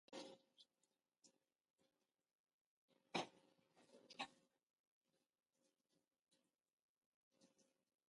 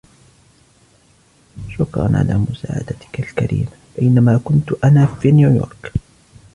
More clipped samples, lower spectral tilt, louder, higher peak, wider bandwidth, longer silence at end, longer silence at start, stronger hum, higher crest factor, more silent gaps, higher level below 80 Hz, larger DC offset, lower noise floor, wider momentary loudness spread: neither; second, -3 dB/octave vs -9 dB/octave; second, -53 LUFS vs -16 LUFS; second, -32 dBFS vs -2 dBFS; about the same, 11 kHz vs 10.5 kHz; about the same, 0.65 s vs 0.55 s; second, 0.1 s vs 1.55 s; neither; first, 30 dB vs 14 dB; first, 1.70-1.74 s, 2.39-2.44 s, 2.53-2.88 s, 4.70-5.01 s, 6.73-7.31 s vs none; second, under -90 dBFS vs -38 dBFS; neither; first, under -90 dBFS vs -53 dBFS; about the same, 14 LU vs 14 LU